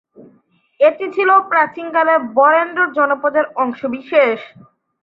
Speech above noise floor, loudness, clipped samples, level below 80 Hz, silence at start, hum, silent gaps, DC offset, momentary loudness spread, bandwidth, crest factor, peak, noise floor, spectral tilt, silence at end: 41 dB; -15 LUFS; under 0.1%; -68 dBFS; 0.8 s; none; none; under 0.1%; 7 LU; 5.2 kHz; 14 dB; -2 dBFS; -56 dBFS; -6.5 dB/octave; 0.55 s